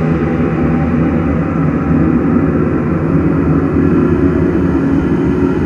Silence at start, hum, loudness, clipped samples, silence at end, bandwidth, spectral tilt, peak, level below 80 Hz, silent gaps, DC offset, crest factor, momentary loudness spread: 0 s; none; -13 LUFS; under 0.1%; 0 s; 6.8 kHz; -10 dB/octave; 0 dBFS; -28 dBFS; none; under 0.1%; 12 dB; 3 LU